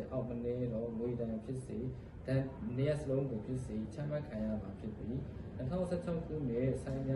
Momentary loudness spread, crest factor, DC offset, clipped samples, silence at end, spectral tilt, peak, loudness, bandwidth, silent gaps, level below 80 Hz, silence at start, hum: 7 LU; 16 dB; under 0.1%; under 0.1%; 0 s; -8.5 dB/octave; -22 dBFS; -39 LUFS; 11.5 kHz; none; -54 dBFS; 0 s; none